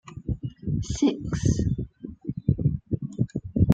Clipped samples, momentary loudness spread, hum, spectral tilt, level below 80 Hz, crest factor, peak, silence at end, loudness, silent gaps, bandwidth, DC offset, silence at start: under 0.1%; 9 LU; none; -7.5 dB/octave; -38 dBFS; 22 dB; -4 dBFS; 0 s; -28 LUFS; none; 9 kHz; under 0.1%; 0.05 s